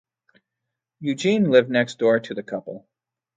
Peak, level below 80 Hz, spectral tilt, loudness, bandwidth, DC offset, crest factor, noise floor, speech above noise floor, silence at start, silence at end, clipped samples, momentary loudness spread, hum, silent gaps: -2 dBFS; -70 dBFS; -6 dB/octave; -21 LUFS; 9.2 kHz; under 0.1%; 20 dB; -83 dBFS; 62 dB; 1 s; 0.6 s; under 0.1%; 15 LU; none; none